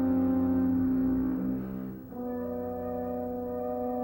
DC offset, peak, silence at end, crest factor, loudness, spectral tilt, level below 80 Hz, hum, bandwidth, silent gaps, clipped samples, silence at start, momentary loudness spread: under 0.1%; -18 dBFS; 0 s; 12 dB; -31 LUFS; -11 dB/octave; -52 dBFS; none; 16 kHz; none; under 0.1%; 0 s; 10 LU